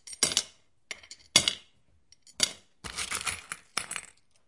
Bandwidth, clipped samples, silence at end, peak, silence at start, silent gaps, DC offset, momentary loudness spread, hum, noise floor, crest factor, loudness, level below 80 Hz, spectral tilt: 11.5 kHz; under 0.1%; 0.45 s; -4 dBFS; 0.05 s; none; under 0.1%; 20 LU; none; -66 dBFS; 30 dB; -29 LUFS; -62 dBFS; 0 dB/octave